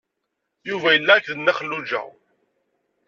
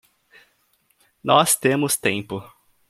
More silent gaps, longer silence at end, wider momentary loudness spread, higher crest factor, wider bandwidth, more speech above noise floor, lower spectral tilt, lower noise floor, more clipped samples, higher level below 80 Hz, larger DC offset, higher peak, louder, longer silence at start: neither; first, 1 s vs 0.45 s; about the same, 17 LU vs 17 LU; about the same, 22 dB vs 22 dB; second, 7.2 kHz vs 16.5 kHz; first, 58 dB vs 45 dB; about the same, -4 dB/octave vs -3 dB/octave; first, -78 dBFS vs -65 dBFS; neither; second, -72 dBFS vs -62 dBFS; neither; about the same, -2 dBFS vs -2 dBFS; about the same, -19 LUFS vs -19 LUFS; second, 0.65 s vs 1.25 s